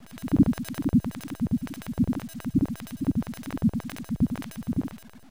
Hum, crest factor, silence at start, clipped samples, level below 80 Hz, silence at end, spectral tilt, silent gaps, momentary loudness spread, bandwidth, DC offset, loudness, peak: none; 18 dB; 0 s; under 0.1%; -44 dBFS; 0.15 s; -7.5 dB/octave; none; 11 LU; 16.5 kHz; 0.2%; -28 LUFS; -8 dBFS